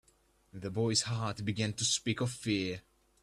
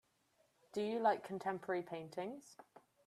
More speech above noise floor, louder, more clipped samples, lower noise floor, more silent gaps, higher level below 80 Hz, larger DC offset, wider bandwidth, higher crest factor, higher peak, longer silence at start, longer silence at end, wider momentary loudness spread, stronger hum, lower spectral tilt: about the same, 35 dB vs 37 dB; first, -33 LUFS vs -41 LUFS; neither; second, -69 dBFS vs -77 dBFS; neither; first, -64 dBFS vs -88 dBFS; neither; about the same, 13 kHz vs 14 kHz; about the same, 20 dB vs 20 dB; first, -16 dBFS vs -22 dBFS; second, 0.55 s vs 0.75 s; first, 0.45 s vs 0.25 s; about the same, 12 LU vs 12 LU; neither; second, -4 dB/octave vs -5.5 dB/octave